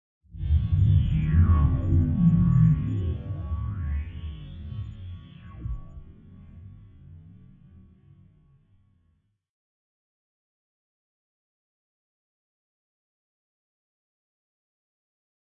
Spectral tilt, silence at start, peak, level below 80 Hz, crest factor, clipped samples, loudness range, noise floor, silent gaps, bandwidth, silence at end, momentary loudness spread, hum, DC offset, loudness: -11 dB/octave; 0.35 s; -10 dBFS; -36 dBFS; 18 dB; under 0.1%; 22 LU; -70 dBFS; none; 3.7 kHz; 8.35 s; 20 LU; none; under 0.1%; -24 LUFS